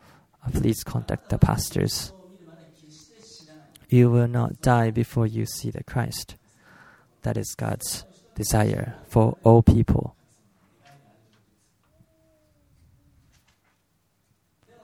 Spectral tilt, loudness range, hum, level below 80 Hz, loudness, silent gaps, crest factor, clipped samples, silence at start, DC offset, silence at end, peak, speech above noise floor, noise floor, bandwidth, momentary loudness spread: -6.5 dB/octave; 7 LU; none; -40 dBFS; -23 LUFS; none; 24 dB; under 0.1%; 0.45 s; under 0.1%; 4.75 s; -2 dBFS; 48 dB; -69 dBFS; 16.5 kHz; 14 LU